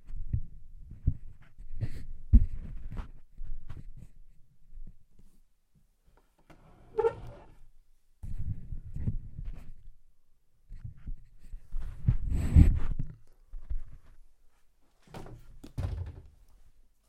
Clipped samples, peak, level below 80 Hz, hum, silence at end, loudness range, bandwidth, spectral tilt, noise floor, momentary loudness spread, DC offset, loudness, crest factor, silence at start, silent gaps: under 0.1%; -6 dBFS; -36 dBFS; none; 0.45 s; 14 LU; 8.6 kHz; -9.5 dB/octave; -66 dBFS; 27 LU; under 0.1%; -33 LUFS; 26 dB; 0.05 s; none